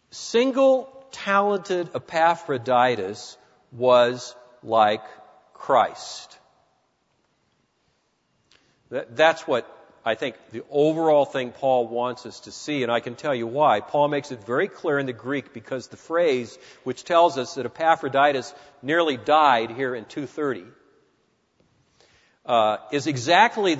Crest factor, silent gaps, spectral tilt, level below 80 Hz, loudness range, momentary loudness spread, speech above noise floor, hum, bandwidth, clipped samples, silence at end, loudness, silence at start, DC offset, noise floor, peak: 22 dB; none; -4.5 dB/octave; -72 dBFS; 6 LU; 16 LU; 47 dB; none; 8 kHz; under 0.1%; 0 s; -23 LUFS; 0.15 s; under 0.1%; -69 dBFS; -2 dBFS